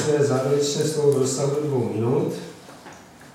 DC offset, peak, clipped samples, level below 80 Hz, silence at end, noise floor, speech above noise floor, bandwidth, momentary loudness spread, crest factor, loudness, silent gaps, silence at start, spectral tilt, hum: under 0.1%; -8 dBFS; under 0.1%; -64 dBFS; 0.05 s; -44 dBFS; 22 dB; 15.5 kHz; 20 LU; 16 dB; -22 LUFS; none; 0 s; -5.5 dB/octave; none